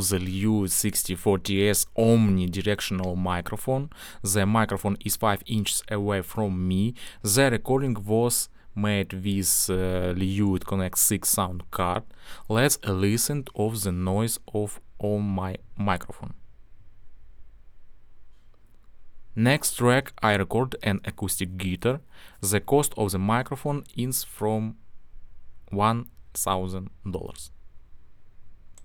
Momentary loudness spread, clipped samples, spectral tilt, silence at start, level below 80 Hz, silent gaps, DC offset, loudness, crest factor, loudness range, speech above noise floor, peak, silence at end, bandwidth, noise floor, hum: 11 LU; under 0.1%; -4.5 dB/octave; 0 s; -48 dBFS; none; under 0.1%; -25 LUFS; 20 dB; 7 LU; 24 dB; -6 dBFS; 0 s; over 20 kHz; -49 dBFS; none